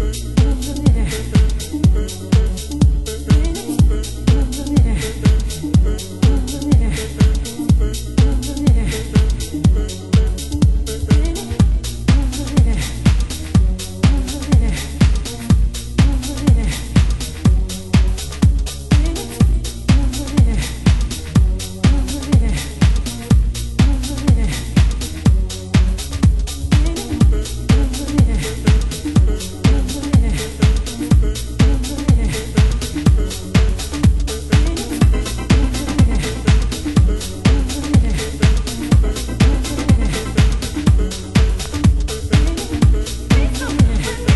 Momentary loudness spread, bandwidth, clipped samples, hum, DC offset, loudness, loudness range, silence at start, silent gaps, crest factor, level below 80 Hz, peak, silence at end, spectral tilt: 4 LU; 12.5 kHz; under 0.1%; none; under 0.1%; -17 LUFS; 1 LU; 0 s; none; 14 dB; -18 dBFS; 0 dBFS; 0 s; -6 dB/octave